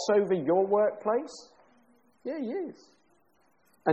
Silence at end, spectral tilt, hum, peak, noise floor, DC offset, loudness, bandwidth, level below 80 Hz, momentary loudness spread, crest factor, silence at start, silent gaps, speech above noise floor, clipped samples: 0 s; -6 dB/octave; none; -12 dBFS; -69 dBFS; under 0.1%; -28 LUFS; 8.4 kHz; -78 dBFS; 17 LU; 18 dB; 0 s; none; 41 dB; under 0.1%